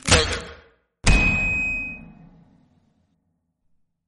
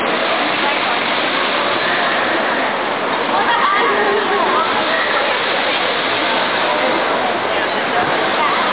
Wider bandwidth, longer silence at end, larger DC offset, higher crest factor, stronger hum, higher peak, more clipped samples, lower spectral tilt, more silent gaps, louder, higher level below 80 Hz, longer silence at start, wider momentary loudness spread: first, 11.5 kHz vs 4 kHz; first, 2.05 s vs 0 s; second, under 0.1% vs 0.4%; first, 22 dB vs 12 dB; neither; about the same, -2 dBFS vs -4 dBFS; neither; second, -3 dB/octave vs -7 dB/octave; neither; second, -21 LUFS vs -15 LUFS; first, -30 dBFS vs -58 dBFS; about the same, 0.05 s vs 0 s; first, 17 LU vs 3 LU